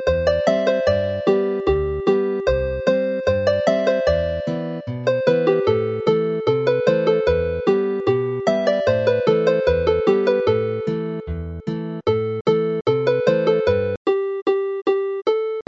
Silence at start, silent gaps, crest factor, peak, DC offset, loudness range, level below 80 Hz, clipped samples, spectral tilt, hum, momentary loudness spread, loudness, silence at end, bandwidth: 0 s; 12.41-12.45 s, 13.97-14.05 s, 14.42-14.46 s; 16 dB; -4 dBFS; under 0.1%; 2 LU; -38 dBFS; under 0.1%; -7 dB/octave; none; 6 LU; -20 LUFS; 0.05 s; 7.8 kHz